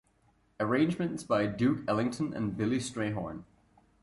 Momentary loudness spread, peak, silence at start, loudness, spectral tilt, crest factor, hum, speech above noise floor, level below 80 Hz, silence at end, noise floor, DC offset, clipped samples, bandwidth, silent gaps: 8 LU; -14 dBFS; 0.6 s; -31 LUFS; -6.5 dB/octave; 16 dB; none; 38 dB; -60 dBFS; 0.6 s; -68 dBFS; under 0.1%; under 0.1%; 11.5 kHz; none